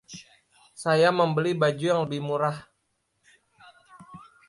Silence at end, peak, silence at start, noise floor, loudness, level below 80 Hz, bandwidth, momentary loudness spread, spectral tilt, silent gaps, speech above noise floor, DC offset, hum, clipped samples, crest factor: 0.3 s; -8 dBFS; 0.1 s; -75 dBFS; -24 LUFS; -68 dBFS; 11.5 kHz; 18 LU; -6 dB/octave; none; 51 dB; under 0.1%; none; under 0.1%; 20 dB